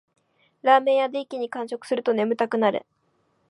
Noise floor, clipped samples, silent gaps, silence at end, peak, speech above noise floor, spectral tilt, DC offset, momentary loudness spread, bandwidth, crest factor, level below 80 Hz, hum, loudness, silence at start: -68 dBFS; under 0.1%; none; 0.7 s; -4 dBFS; 46 dB; -5.5 dB/octave; under 0.1%; 12 LU; 11.5 kHz; 20 dB; -80 dBFS; none; -23 LUFS; 0.65 s